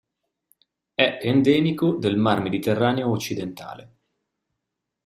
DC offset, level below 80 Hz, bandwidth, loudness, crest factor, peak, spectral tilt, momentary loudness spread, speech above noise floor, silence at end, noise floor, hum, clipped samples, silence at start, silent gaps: under 0.1%; -60 dBFS; 15.5 kHz; -22 LUFS; 22 dB; -2 dBFS; -6 dB/octave; 12 LU; 61 dB; 1.2 s; -82 dBFS; none; under 0.1%; 1 s; none